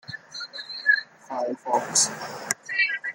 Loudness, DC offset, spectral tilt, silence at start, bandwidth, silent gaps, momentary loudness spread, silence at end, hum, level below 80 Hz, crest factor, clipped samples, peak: -24 LUFS; under 0.1%; 0 dB/octave; 0.1 s; 17 kHz; none; 14 LU; 0 s; none; -76 dBFS; 24 dB; under 0.1%; -2 dBFS